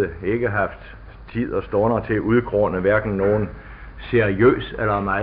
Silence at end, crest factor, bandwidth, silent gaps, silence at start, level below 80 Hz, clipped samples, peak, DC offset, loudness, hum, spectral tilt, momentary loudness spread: 0 s; 16 dB; 5 kHz; none; 0 s; -40 dBFS; under 0.1%; -4 dBFS; under 0.1%; -21 LUFS; none; -12 dB/octave; 16 LU